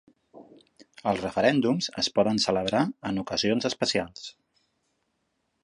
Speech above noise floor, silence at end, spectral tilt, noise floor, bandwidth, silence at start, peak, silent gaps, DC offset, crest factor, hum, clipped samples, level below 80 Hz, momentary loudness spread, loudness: 50 dB; 1.3 s; -4.5 dB/octave; -76 dBFS; 11.5 kHz; 0.35 s; -8 dBFS; none; under 0.1%; 20 dB; none; under 0.1%; -60 dBFS; 9 LU; -26 LUFS